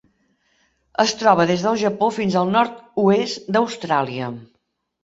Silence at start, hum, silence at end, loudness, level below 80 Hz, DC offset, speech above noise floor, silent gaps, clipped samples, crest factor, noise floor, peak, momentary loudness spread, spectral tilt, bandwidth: 1 s; none; 0.6 s; -19 LUFS; -62 dBFS; under 0.1%; 52 dB; none; under 0.1%; 20 dB; -71 dBFS; 0 dBFS; 11 LU; -5 dB/octave; 8 kHz